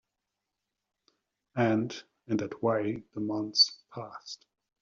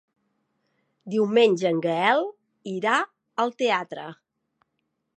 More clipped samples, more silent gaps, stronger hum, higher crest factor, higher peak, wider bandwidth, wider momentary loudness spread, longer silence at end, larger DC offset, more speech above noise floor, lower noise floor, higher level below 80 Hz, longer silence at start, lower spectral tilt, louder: neither; neither; neither; about the same, 22 dB vs 20 dB; second, -12 dBFS vs -6 dBFS; second, 7.4 kHz vs 9.2 kHz; first, 20 LU vs 17 LU; second, 0.45 s vs 1.05 s; neither; about the same, 56 dB vs 55 dB; first, -86 dBFS vs -77 dBFS; first, -72 dBFS vs -82 dBFS; first, 1.55 s vs 1.05 s; second, -3.5 dB/octave vs -5 dB/octave; second, -29 LUFS vs -23 LUFS